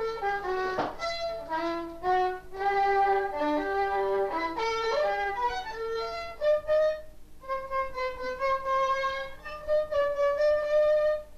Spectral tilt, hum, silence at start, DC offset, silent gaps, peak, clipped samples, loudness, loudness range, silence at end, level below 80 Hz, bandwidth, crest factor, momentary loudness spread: -4 dB/octave; none; 0 s; under 0.1%; none; -16 dBFS; under 0.1%; -28 LUFS; 3 LU; 0 s; -50 dBFS; 14 kHz; 12 dB; 9 LU